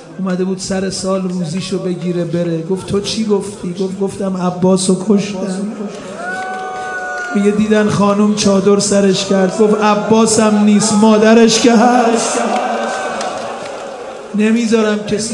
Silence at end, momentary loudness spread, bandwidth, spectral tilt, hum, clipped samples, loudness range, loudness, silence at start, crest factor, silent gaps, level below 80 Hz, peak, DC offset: 0 s; 13 LU; 11.5 kHz; -5 dB/octave; none; under 0.1%; 8 LU; -14 LUFS; 0 s; 14 dB; none; -52 dBFS; 0 dBFS; under 0.1%